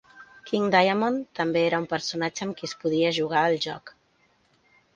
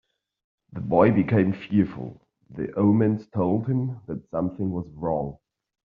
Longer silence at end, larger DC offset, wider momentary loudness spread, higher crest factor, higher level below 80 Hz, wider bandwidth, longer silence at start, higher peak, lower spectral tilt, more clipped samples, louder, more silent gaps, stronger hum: first, 1.05 s vs 0.5 s; neither; second, 12 LU vs 16 LU; about the same, 22 dB vs 20 dB; second, -68 dBFS vs -56 dBFS; first, 9.4 kHz vs 4.8 kHz; second, 0.15 s vs 0.75 s; about the same, -4 dBFS vs -4 dBFS; second, -4.5 dB/octave vs -9 dB/octave; neither; about the same, -25 LUFS vs -24 LUFS; neither; neither